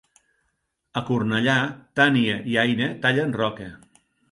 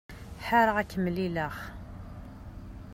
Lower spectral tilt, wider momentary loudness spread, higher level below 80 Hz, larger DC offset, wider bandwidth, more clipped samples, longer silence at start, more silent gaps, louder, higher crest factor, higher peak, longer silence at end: about the same, -6 dB/octave vs -6.5 dB/octave; second, 12 LU vs 22 LU; second, -60 dBFS vs -48 dBFS; neither; second, 11.5 kHz vs 16 kHz; neither; first, 0.95 s vs 0.1 s; neither; first, -22 LUFS vs -28 LUFS; about the same, 20 dB vs 22 dB; first, -4 dBFS vs -10 dBFS; first, 0.55 s vs 0 s